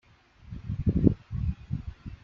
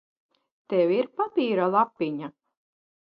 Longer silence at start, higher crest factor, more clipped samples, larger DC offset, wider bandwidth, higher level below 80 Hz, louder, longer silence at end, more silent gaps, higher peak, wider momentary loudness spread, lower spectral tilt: second, 0.45 s vs 0.7 s; first, 26 dB vs 18 dB; neither; neither; about the same, 5.8 kHz vs 5.4 kHz; first, -40 dBFS vs -80 dBFS; second, -30 LUFS vs -25 LUFS; second, 0.1 s vs 0.85 s; neither; first, -4 dBFS vs -8 dBFS; first, 18 LU vs 9 LU; first, -11.5 dB/octave vs -9.5 dB/octave